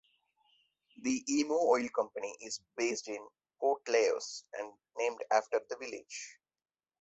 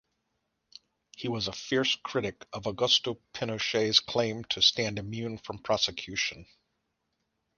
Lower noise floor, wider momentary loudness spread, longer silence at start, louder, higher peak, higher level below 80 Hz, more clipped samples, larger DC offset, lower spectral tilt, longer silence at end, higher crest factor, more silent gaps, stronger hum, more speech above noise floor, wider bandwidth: first, under -90 dBFS vs -80 dBFS; about the same, 14 LU vs 13 LU; second, 1 s vs 1.2 s; second, -34 LUFS vs -28 LUFS; second, -14 dBFS vs -8 dBFS; second, -80 dBFS vs -62 dBFS; neither; neither; about the same, -2 dB/octave vs -3 dB/octave; second, 0.7 s vs 1.15 s; about the same, 22 dB vs 24 dB; neither; neither; first, over 56 dB vs 50 dB; second, 8.4 kHz vs 10.5 kHz